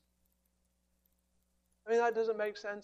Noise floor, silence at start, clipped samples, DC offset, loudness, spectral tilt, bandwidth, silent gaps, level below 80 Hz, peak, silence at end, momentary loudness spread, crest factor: -78 dBFS; 1.85 s; under 0.1%; under 0.1%; -34 LUFS; -4 dB/octave; 15 kHz; none; -80 dBFS; -20 dBFS; 0 s; 9 LU; 18 dB